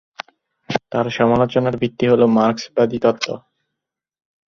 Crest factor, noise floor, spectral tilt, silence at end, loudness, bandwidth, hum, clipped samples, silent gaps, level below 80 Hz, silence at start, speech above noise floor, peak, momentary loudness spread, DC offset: 18 dB; -82 dBFS; -6.5 dB/octave; 1.1 s; -18 LUFS; 7.2 kHz; none; under 0.1%; none; -54 dBFS; 0.7 s; 65 dB; -2 dBFS; 17 LU; under 0.1%